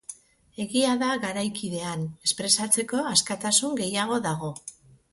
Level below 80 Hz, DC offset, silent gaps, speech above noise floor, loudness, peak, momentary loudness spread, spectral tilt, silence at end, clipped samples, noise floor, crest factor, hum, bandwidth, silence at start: -64 dBFS; under 0.1%; none; 20 dB; -25 LUFS; -6 dBFS; 12 LU; -2.5 dB/octave; 0.4 s; under 0.1%; -46 dBFS; 22 dB; none; 12 kHz; 0.1 s